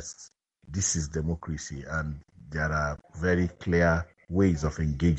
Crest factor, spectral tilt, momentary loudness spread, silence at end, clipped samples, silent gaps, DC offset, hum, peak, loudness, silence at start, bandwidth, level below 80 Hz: 18 dB; -5.5 dB/octave; 13 LU; 0 s; under 0.1%; none; under 0.1%; none; -10 dBFS; -29 LUFS; 0 s; 8.8 kHz; -40 dBFS